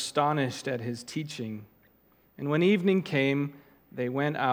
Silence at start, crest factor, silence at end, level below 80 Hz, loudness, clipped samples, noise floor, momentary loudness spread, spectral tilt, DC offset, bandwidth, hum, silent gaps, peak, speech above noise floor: 0 s; 20 dB; 0 s; -74 dBFS; -29 LUFS; under 0.1%; -64 dBFS; 13 LU; -6 dB/octave; under 0.1%; 16.5 kHz; none; none; -10 dBFS; 36 dB